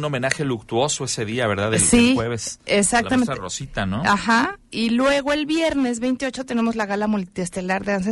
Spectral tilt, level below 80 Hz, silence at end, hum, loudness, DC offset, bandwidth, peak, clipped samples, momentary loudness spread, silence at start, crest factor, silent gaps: -4 dB/octave; -44 dBFS; 0 s; none; -21 LUFS; under 0.1%; 11.5 kHz; 0 dBFS; under 0.1%; 8 LU; 0 s; 20 dB; none